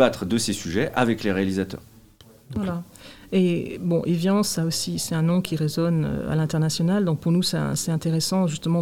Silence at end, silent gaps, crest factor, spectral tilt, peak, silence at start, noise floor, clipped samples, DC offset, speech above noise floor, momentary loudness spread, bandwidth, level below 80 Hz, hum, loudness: 0 s; none; 20 dB; -5.5 dB/octave; -4 dBFS; 0 s; -51 dBFS; under 0.1%; 0.3%; 28 dB; 7 LU; 16.5 kHz; -52 dBFS; none; -23 LUFS